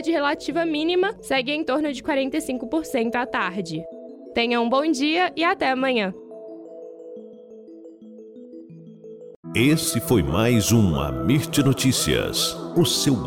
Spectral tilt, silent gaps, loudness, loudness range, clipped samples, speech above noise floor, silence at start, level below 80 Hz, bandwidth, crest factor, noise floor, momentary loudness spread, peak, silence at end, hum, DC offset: -4.5 dB/octave; 9.36-9.43 s; -22 LUFS; 9 LU; under 0.1%; 21 dB; 0 s; -44 dBFS; 17 kHz; 16 dB; -43 dBFS; 22 LU; -8 dBFS; 0 s; none; under 0.1%